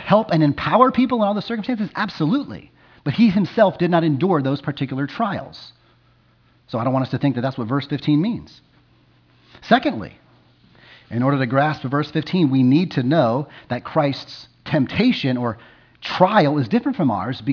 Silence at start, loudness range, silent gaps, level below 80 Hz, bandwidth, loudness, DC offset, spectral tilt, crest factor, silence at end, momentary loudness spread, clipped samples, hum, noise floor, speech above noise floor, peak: 0 s; 5 LU; none; -56 dBFS; 5.4 kHz; -20 LUFS; under 0.1%; -8.5 dB/octave; 20 dB; 0 s; 14 LU; under 0.1%; none; -57 dBFS; 38 dB; 0 dBFS